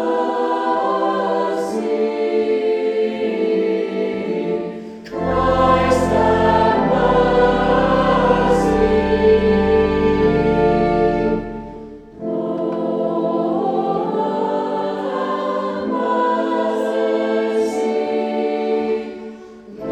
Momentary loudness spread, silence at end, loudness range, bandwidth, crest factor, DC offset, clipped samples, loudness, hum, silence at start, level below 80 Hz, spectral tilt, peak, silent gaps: 9 LU; 0 s; 5 LU; 10 kHz; 16 dB; under 0.1%; under 0.1%; -18 LUFS; none; 0 s; -36 dBFS; -7 dB/octave; -2 dBFS; none